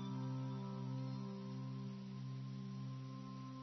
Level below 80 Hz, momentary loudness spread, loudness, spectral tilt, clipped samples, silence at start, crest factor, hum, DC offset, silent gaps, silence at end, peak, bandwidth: -78 dBFS; 5 LU; -47 LUFS; -8 dB/octave; under 0.1%; 0 s; 10 dB; none; under 0.1%; none; 0 s; -34 dBFS; 6 kHz